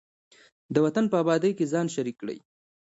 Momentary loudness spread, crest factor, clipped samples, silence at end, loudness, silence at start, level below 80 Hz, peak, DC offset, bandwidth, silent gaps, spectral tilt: 14 LU; 20 dB; under 0.1%; 0.55 s; -26 LUFS; 0.7 s; -70 dBFS; -8 dBFS; under 0.1%; 8 kHz; none; -6.5 dB/octave